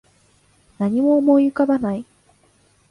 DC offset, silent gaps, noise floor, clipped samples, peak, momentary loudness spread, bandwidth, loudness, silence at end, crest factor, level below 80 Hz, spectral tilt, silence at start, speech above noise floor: under 0.1%; none; -58 dBFS; under 0.1%; -4 dBFS; 11 LU; 10.5 kHz; -18 LUFS; 0.9 s; 16 dB; -60 dBFS; -9 dB/octave; 0.8 s; 41 dB